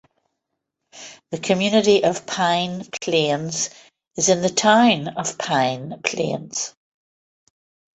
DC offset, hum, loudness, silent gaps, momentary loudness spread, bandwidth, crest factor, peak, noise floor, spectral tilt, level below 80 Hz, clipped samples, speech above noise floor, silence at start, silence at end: under 0.1%; none; -20 LUFS; none; 14 LU; 8.4 kHz; 20 dB; -2 dBFS; -79 dBFS; -3.5 dB/octave; -62 dBFS; under 0.1%; 59 dB; 0.95 s; 1.25 s